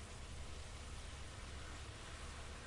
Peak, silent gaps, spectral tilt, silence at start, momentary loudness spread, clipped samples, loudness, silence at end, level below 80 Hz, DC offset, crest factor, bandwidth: -38 dBFS; none; -3.5 dB/octave; 0 s; 1 LU; under 0.1%; -52 LUFS; 0 s; -54 dBFS; under 0.1%; 12 dB; 11.5 kHz